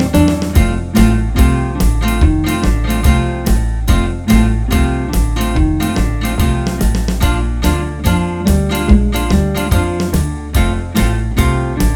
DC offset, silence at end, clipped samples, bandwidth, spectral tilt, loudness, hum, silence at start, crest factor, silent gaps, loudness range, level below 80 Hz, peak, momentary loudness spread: under 0.1%; 0 s; 0.2%; over 20 kHz; -6 dB/octave; -15 LUFS; none; 0 s; 12 dB; none; 2 LU; -16 dBFS; 0 dBFS; 4 LU